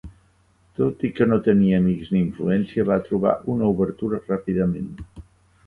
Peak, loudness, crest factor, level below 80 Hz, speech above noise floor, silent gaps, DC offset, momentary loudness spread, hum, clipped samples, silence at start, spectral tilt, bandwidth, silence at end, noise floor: -4 dBFS; -22 LUFS; 18 dB; -48 dBFS; 39 dB; none; under 0.1%; 11 LU; none; under 0.1%; 0.05 s; -10 dB/octave; 4.2 kHz; 0.45 s; -59 dBFS